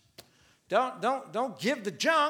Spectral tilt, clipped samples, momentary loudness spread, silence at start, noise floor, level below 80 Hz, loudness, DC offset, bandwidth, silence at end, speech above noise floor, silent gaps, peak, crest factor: -3.5 dB/octave; under 0.1%; 4 LU; 0.2 s; -62 dBFS; -80 dBFS; -30 LUFS; under 0.1%; 17.5 kHz; 0 s; 34 dB; none; -10 dBFS; 20 dB